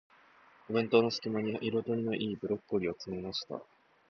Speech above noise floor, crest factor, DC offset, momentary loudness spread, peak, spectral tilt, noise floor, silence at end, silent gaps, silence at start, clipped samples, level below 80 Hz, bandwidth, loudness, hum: 29 dB; 22 dB; under 0.1%; 10 LU; -12 dBFS; -6 dB/octave; -61 dBFS; 0.45 s; none; 0.7 s; under 0.1%; -68 dBFS; 6.8 kHz; -33 LUFS; none